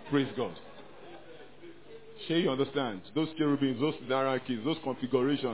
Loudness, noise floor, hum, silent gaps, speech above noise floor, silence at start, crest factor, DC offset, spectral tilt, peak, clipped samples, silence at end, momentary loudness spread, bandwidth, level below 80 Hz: -31 LUFS; -52 dBFS; none; none; 21 dB; 0 s; 18 dB; 0.3%; -4.5 dB/octave; -14 dBFS; under 0.1%; 0 s; 22 LU; 4 kHz; -70 dBFS